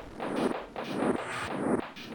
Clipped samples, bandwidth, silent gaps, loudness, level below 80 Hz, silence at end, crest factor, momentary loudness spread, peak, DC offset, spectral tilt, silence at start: under 0.1%; 18 kHz; none; -32 LUFS; -58 dBFS; 0 s; 16 dB; 5 LU; -16 dBFS; under 0.1%; -5.5 dB/octave; 0 s